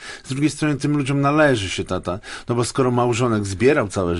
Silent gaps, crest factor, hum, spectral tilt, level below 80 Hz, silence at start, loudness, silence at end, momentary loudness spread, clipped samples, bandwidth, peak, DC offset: none; 18 dB; none; -5.5 dB/octave; -42 dBFS; 0 s; -20 LUFS; 0 s; 9 LU; under 0.1%; 11.5 kHz; -2 dBFS; under 0.1%